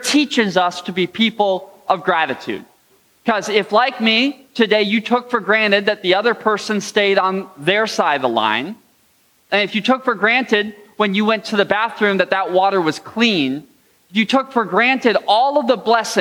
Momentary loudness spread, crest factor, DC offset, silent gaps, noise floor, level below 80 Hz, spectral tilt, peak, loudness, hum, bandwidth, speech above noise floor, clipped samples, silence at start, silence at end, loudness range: 7 LU; 16 dB; under 0.1%; none; -57 dBFS; -68 dBFS; -4 dB/octave; -2 dBFS; -17 LUFS; none; 18.5 kHz; 40 dB; under 0.1%; 0 s; 0 s; 2 LU